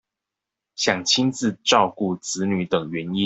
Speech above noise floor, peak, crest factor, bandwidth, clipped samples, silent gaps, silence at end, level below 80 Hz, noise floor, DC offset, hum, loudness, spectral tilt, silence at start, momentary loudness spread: 64 dB; -2 dBFS; 20 dB; 8.4 kHz; under 0.1%; none; 0 s; -62 dBFS; -86 dBFS; under 0.1%; none; -21 LUFS; -3.5 dB/octave; 0.8 s; 8 LU